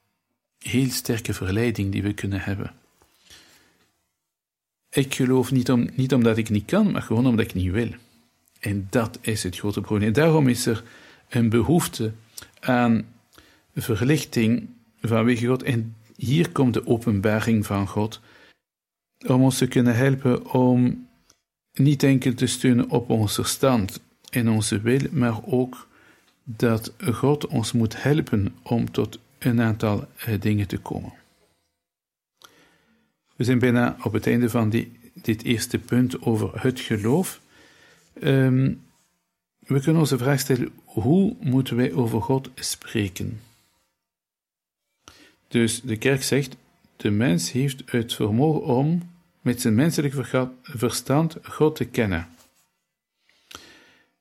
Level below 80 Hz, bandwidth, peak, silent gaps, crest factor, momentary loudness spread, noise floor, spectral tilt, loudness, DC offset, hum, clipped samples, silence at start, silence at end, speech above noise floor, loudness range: -54 dBFS; 16.5 kHz; -6 dBFS; none; 18 dB; 10 LU; -90 dBFS; -6 dB/octave; -23 LUFS; under 0.1%; none; under 0.1%; 0.6 s; 0.65 s; 68 dB; 6 LU